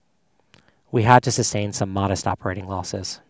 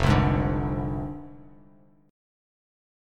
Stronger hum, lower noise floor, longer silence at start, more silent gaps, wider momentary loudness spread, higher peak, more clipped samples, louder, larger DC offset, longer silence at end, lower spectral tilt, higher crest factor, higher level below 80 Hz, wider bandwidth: neither; first, -67 dBFS vs -57 dBFS; first, 0.95 s vs 0 s; neither; second, 13 LU vs 19 LU; first, 0 dBFS vs -6 dBFS; neither; first, -21 LUFS vs -26 LUFS; neither; second, 0.15 s vs 1.7 s; second, -4.5 dB/octave vs -7.5 dB/octave; about the same, 22 dB vs 22 dB; second, -44 dBFS vs -36 dBFS; second, 8 kHz vs 10 kHz